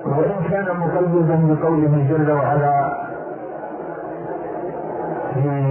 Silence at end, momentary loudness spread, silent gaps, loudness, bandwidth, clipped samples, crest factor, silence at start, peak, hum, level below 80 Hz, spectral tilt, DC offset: 0 s; 13 LU; none; -20 LUFS; 3.1 kHz; under 0.1%; 14 dB; 0 s; -6 dBFS; none; -54 dBFS; -14 dB/octave; under 0.1%